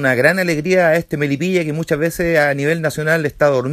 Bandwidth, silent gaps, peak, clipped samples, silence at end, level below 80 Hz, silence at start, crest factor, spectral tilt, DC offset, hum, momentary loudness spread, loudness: 15.5 kHz; none; 0 dBFS; under 0.1%; 0 s; -46 dBFS; 0 s; 16 dB; -6 dB/octave; under 0.1%; none; 5 LU; -16 LUFS